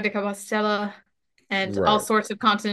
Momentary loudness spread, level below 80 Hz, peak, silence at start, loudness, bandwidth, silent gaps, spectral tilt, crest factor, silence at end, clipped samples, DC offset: 7 LU; -60 dBFS; -6 dBFS; 0 s; -24 LUFS; 12.5 kHz; none; -4 dB/octave; 18 dB; 0 s; under 0.1%; under 0.1%